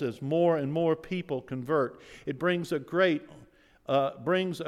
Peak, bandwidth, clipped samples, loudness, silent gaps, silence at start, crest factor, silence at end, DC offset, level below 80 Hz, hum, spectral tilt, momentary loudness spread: -12 dBFS; 14 kHz; under 0.1%; -29 LUFS; none; 0 s; 18 dB; 0 s; under 0.1%; -66 dBFS; none; -7 dB/octave; 9 LU